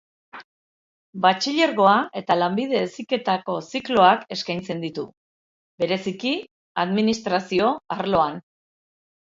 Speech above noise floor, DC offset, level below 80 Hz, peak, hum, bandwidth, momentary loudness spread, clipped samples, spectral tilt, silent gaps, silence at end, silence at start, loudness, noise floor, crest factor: over 68 dB; under 0.1%; -62 dBFS; -2 dBFS; none; 7.8 kHz; 12 LU; under 0.1%; -5 dB/octave; 0.44-1.13 s, 5.17-5.78 s, 6.51-6.75 s; 0.8 s; 0.35 s; -22 LUFS; under -90 dBFS; 22 dB